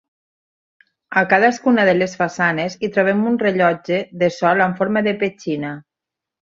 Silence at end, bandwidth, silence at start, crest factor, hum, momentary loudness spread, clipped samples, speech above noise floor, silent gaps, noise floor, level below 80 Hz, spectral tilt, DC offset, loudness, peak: 0.75 s; 7.8 kHz; 1.1 s; 18 dB; none; 8 LU; under 0.1%; 68 dB; none; -85 dBFS; -62 dBFS; -6 dB/octave; under 0.1%; -18 LUFS; 0 dBFS